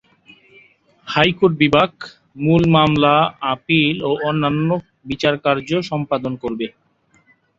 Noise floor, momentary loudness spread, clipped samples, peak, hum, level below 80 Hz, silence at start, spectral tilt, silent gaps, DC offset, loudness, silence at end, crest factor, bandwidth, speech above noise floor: -57 dBFS; 11 LU; under 0.1%; -2 dBFS; none; -48 dBFS; 1.05 s; -7 dB/octave; none; under 0.1%; -17 LUFS; 0.9 s; 18 dB; 7.6 kHz; 40 dB